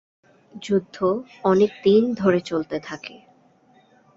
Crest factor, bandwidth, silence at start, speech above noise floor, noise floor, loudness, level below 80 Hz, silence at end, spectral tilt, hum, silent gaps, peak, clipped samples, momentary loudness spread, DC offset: 18 dB; 7.8 kHz; 0.55 s; 36 dB; -57 dBFS; -21 LUFS; -62 dBFS; 1.05 s; -7 dB/octave; none; none; -6 dBFS; under 0.1%; 17 LU; under 0.1%